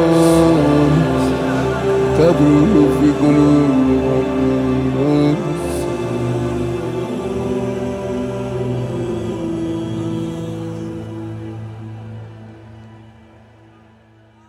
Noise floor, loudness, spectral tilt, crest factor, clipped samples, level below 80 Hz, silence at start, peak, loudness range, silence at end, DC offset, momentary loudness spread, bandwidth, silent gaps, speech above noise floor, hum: -48 dBFS; -16 LUFS; -7.5 dB/octave; 16 dB; under 0.1%; -36 dBFS; 0 s; 0 dBFS; 16 LU; 1.4 s; under 0.1%; 16 LU; 15 kHz; none; 36 dB; none